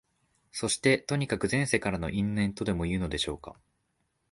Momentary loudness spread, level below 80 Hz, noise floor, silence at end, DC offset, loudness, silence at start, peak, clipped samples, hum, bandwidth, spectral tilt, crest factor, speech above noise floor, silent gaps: 9 LU; -48 dBFS; -76 dBFS; 0.8 s; under 0.1%; -29 LUFS; 0.55 s; -8 dBFS; under 0.1%; none; 11.5 kHz; -4.5 dB/octave; 22 dB; 47 dB; none